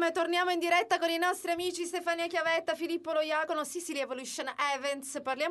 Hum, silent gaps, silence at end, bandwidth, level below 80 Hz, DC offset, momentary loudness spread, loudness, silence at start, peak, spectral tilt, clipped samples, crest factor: none; none; 0 s; 12 kHz; -78 dBFS; under 0.1%; 8 LU; -31 LUFS; 0 s; -14 dBFS; -1.5 dB/octave; under 0.1%; 16 dB